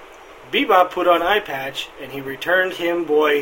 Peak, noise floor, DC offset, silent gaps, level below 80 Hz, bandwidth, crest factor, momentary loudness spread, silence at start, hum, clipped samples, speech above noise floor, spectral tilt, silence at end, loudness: 0 dBFS; -41 dBFS; under 0.1%; none; -54 dBFS; 16.5 kHz; 20 dB; 14 LU; 0 s; none; under 0.1%; 23 dB; -4 dB/octave; 0 s; -19 LUFS